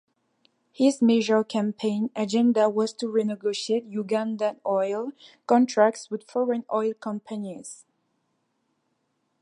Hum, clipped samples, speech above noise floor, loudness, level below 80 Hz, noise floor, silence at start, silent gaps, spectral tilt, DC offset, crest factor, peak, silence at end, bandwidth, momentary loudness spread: none; under 0.1%; 50 dB; -25 LUFS; -78 dBFS; -74 dBFS; 0.8 s; none; -5 dB/octave; under 0.1%; 20 dB; -6 dBFS; 1.65 s; 11 kHz; 13 LU